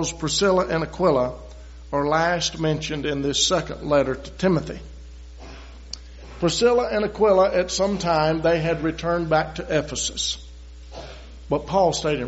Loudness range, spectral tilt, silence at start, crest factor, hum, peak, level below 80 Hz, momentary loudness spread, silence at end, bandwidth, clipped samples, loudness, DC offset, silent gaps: 4 LU; -4 dB/octave; 0 s; 16 dB; none; -6 dBFS; -40 dBFS; 21 LU; 0 s; 8 kHz; under 0.1%; -22 LUFS; under 0.1%; none